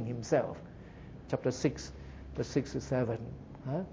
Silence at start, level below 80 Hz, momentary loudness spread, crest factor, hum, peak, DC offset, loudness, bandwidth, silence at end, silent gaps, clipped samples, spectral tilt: 0 s; -52 dBFS; 17 LU; 20 dB; none; -16 dBFS; under 0.1%; -35 LUFS; 7.8 kHz; 0 s; none; under 0.1%; -6.5 dB/octave